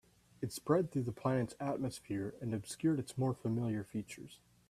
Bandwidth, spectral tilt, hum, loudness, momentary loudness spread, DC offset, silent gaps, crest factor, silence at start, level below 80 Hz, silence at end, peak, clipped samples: 15 kHz; -7 dB/octave; none; -38 LUFS; 10 LU; under 0.1%; none; 20 dB; 0.4 s; -68 dBFS; 0.35 s; -16 dBFS; under 0.1%